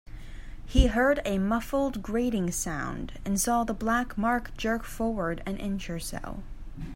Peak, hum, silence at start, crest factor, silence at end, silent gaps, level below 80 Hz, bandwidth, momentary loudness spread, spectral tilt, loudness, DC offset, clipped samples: -6 dBFS; none; 0.1 s; 22 dB; 0 s; none; -36 dBFS; 16 kHz; 17 LU; -5 dB/octave; -29 LUFS; under 0.1%; under 0.1%